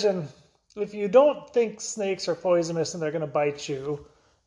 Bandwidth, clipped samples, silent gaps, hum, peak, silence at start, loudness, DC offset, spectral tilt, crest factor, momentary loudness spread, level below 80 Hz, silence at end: 11 kHz; under 0.1%; none; none; -6 dBFS; 0 s; -26 LUFS; under 0.1%; -5 dB/octave; 20 dB; 15 LU; -66 dBFS; 0.4 s